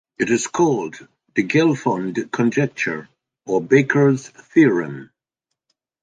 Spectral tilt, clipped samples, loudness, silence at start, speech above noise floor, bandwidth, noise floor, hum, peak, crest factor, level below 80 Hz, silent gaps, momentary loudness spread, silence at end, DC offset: -6 dB/octave; under 0.1%; -19 LUFS; 0.2 s; 63 dB; 9.6 kHz; -81 dBFS; none; -2 dBFS; 18 dB; -64 dBFS; none; 10 LU; 1 s; under 0.1%